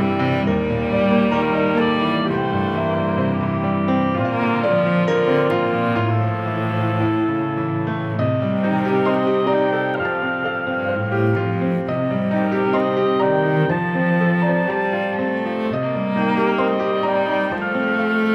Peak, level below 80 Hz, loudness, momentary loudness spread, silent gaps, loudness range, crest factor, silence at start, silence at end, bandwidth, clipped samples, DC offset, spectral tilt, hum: -4 dBFS; -50 dBFS; -19 LUFS; 4 LU; none; 2 LU; 14 dB; 0 s; 0 s; 6.6 kHz; under 0.1%; under 0.1%; -8.5 dB/octave; none